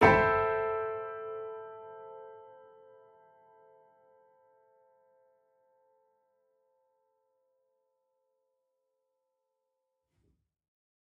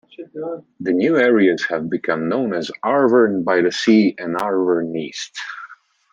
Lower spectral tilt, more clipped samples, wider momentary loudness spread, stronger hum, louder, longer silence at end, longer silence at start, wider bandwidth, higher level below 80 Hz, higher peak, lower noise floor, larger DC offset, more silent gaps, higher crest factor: about the same, -4.5 dB/octave vs -5.5 dB/octave; neither; first, 25 LU vs 15 LU; neither; second, -30 LUFS vs -18 LUFS; first, 8.7 s vs 0.4 s; second, 0 s vs 0.2 s; second, 5.8 kHz vs 9.8 kHz; first, -60 dBFS vs -68 dBFS; second, -6 dBFS vs -2 dBFS; first, -84 dBFS vs -42 dBFS; neither; neither; first, 30 dB vs 16 dB